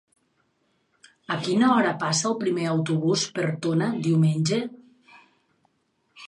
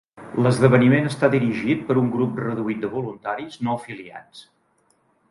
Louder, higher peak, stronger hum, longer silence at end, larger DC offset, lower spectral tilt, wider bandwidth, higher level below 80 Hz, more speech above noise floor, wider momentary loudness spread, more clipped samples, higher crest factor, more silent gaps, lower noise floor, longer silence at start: second, -24 LUFS vs -21 LUFS; second, -8 dBFS vs -2 dBFS; neither; second, 0.05 s vs 0.9 s; neither; second, -5 dB/octave vs -7.5 dB/octave; about the same, 11 kHz vs 11.5 kHz; second, -70 dBFS vs -60 dBFS; first, 48 dB vs 43 dB; second, 7 LU vs 14 LU; neither; about the same, 18 dB vs 20 dB; neither; first, -71 dBFS vs -64 dBFS; first, 1.3 s vs 0.15 s